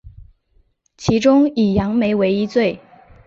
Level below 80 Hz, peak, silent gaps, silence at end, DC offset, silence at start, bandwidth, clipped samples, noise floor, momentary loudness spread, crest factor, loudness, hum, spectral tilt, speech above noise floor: -42 dBFS; -2 dBFS; none; 0.5 s; under 0.1%; 0.05 s; 7.8 kHz; under 0.1%; -59 dBFS; 8 LU; 16 dB; -17 LUFS; none; -6.5 dB/octave; 43 dB